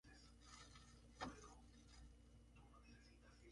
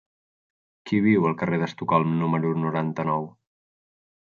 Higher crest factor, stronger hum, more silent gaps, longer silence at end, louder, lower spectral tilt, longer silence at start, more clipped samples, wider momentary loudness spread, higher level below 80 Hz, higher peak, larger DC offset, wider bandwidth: first, 26 dB vs 18 dB; neither; neither; second, 0 s vs 1.05 s; second, -62 LUFS vs -24 LUFS; second, -4 dB/octave vs -8.5 dB/octave; second, 0.05 s vs 0.85 s; neither; first, 13 LU vs 6 LU; about the same, -68 dBFS vs -64 dBFS; second, -36 dBFS vs -6 dBFS; neither; first, 11 kHz vs 7 kHz